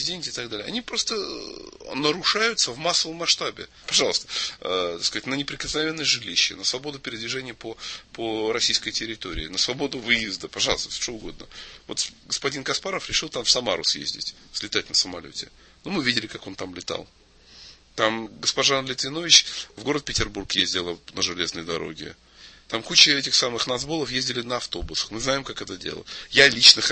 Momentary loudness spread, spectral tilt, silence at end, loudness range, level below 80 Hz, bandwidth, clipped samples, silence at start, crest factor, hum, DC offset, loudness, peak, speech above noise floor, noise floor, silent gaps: 15 LU; -1.5 dB/octave; 0 s; 5 LU; -50 dBFS; 11 kHz; under 0.1%; 0 s; 26 dB; none; under 0.1%; -22 LUFS; 0 dBFS; 24 dB; -49 dBFS; none